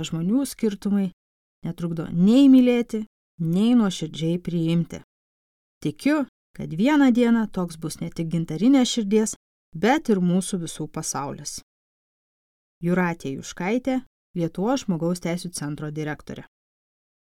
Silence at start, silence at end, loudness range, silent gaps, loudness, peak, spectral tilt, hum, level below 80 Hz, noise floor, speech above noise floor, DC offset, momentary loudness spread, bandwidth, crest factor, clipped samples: 0 s; 0.8 s; 8 LU; 1.13-1.62 s, 3.07-3.38 s, 5.04-5.81 s, 6.28-6.54 s, 9.36-9.72 s, 11.63-12.81 s, 14.06-14.34 s; -23 LUFS; -6 dBFS; -6 dB/octave; none; -54 dBFS; under -90 dBFS; over 68 dB; under 0.1%; 15 LU; 15 kHz; 18 dB; under 0.1%